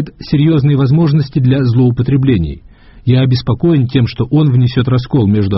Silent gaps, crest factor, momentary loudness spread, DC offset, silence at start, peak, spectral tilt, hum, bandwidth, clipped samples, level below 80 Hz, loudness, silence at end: none; 12 dB; 4 LU; under 0.1%; 0 s; 0 dBFS; -8 dB/octave; none; 5.8 kHz; under 0.1%; -34 dBFS; -12 LUFS; 0 s